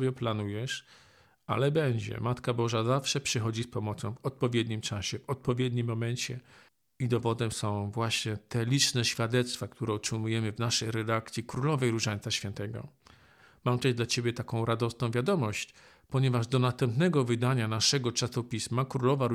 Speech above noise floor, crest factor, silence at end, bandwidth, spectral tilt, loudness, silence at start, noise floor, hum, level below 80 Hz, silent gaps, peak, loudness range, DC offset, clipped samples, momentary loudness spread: 30 dB; 20 dB; 0 s; 15 kHz; -5 dB/octave; -30 LUFS; 0 s; -60 dBFS; none; -62 dBFS; none; -10 dBFS; 4 LU; under 0.1%; under 0.1%; 9 LU